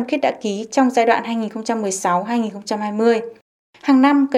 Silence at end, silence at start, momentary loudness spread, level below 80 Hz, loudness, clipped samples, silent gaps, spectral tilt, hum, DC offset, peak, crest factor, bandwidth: 0 s; 0 s; 10 LU; -72 dBFS; -19 LUFS; under 0.1%; 3.42-3.73 s; -4.5 dB/octave; none; under 0.1%; -2 dBFS; 16 dB; 12.5 kHz